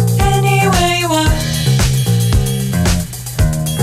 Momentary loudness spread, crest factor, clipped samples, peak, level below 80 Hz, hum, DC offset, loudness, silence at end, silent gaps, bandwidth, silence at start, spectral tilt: 5 LU; 10 dB; under 0.1%; -2 dBFS; -22 dBFS; none; under 0.1%; -14 LUFS; 0 s; none; 16 kHz; 0 s; -5 dB/octave